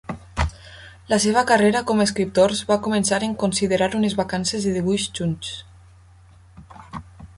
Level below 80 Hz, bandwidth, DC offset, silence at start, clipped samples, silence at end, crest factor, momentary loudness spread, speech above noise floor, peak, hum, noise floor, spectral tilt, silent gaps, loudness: -40 dBFS; 11.5 kHz; under 0.1%; 0.1 s; under 0.1%; 0.1 s; 18 dB; 20 LU; 29 dB; -4 dBFS; none; -49 dBFS; -4.5 dB/octave; none; -21 LUFS